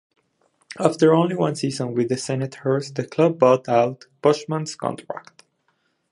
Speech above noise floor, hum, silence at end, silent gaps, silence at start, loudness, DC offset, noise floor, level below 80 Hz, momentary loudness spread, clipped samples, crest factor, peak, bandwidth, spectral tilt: 48 dB; none; 0.9 s; none; 0.7 s; -21 LUFS; under 0.1%; -69 dBFS; -68 dBFS; 12 LU; under 0.1%; 20 dB; -2 dBFS; 11.5 kHz; -6 dB/octave